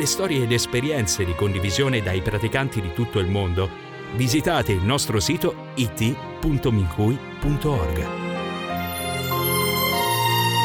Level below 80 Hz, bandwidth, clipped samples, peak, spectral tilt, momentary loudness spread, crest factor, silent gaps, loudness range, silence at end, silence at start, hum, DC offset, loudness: -38 dBFS; 19 kHz; under 0.1%; -6 dBFS; -4.5 dB/octave; 7 LU; 16 dB; none; 2 LU; 0 s; 0 s; none; under 0.1%; -23 LUFS